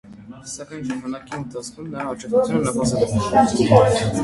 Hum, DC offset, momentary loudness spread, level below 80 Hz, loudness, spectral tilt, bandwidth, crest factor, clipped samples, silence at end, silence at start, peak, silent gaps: none; under 0.1%; 18 LU; -44 dBFS; -19 LUFS; -6 dB/octave; 11.5 kHz; 20 dB; under 0.1%; 0 s; 0.05 s; 0 dBFS; none